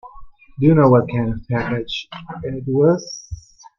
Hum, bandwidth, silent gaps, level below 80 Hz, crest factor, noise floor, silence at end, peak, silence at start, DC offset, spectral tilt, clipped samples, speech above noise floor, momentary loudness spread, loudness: none; 7.2 kHz; none; -42 dBFS; 18 dB; -39 dBFS; 0.4 s; -2 dBFS; 0.05 s; under 0.1%; -7 dB/octave; under 0.1%; 21 dB; 19 LU; -18 LUFS